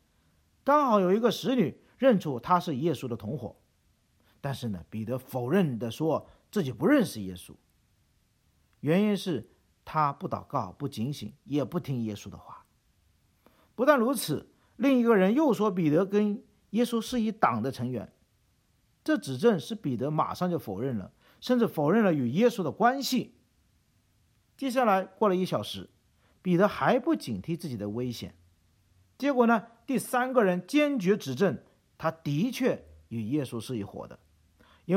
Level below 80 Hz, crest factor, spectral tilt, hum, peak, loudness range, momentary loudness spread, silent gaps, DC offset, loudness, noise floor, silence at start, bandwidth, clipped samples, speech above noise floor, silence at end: -66 dBFS; 22 dB; -6.5 dB/octave; none; -6 dBFS; 6 LU; 14 LU; none; under 0.1%; -28 LUFS; -69 dBFS; 0.65 s; 16.5 kHz; under 0.1%; 42 dB; 0 s